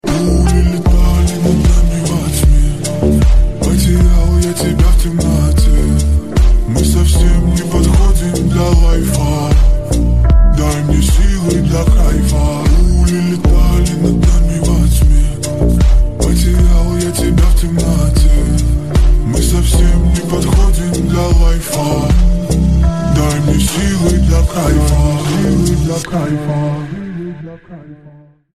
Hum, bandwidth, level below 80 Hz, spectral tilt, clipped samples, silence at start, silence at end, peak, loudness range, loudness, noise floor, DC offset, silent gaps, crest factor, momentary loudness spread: none; 14.5 kHz; -12 dBFS; -6 dB/octave; under 0.1%; 0.05 s; 0.35 s; 0 dBFS; 1 LU; -13 LUFS; -40 dBFS; 2%; none; 10 dB; 4 LU